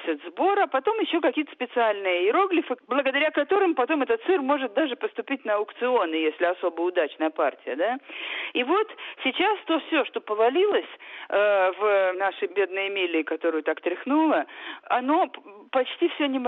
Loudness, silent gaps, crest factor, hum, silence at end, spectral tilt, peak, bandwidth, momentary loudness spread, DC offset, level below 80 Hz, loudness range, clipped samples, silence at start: -25 LUFS; none; 14 dB; none; 0 s; -5.5 dB/octave; -10 dBFS; 4.1 kHz; 7 LU; under 0.1%; -76 dBFS; 3 LU; under 0.1%; 0 s